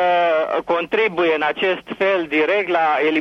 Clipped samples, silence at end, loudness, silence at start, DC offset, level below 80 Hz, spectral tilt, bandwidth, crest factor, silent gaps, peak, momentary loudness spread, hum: under 0.1%; 0 s; -18 LUFS; 0 s; under 0.1%; -62 dBFS; -5.5 dB/octave; 6.8 kHz; 12 dB; none; -6 dBFS; 4 LU; none